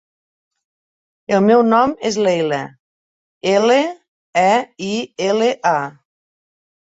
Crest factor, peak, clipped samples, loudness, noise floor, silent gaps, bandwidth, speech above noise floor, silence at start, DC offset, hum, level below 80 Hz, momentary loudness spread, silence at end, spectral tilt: 16 dB; -2 dBFS; under 0.1%; -17 LUFS; under -90 dBFS; 2.80-3.41 s, 4.08-4.33 s; 8 kHz; over 74 dB; 1.3 s; under 0.1%; none; -62 dBFS; 12 LU; 0.9 s; -5 dB/octave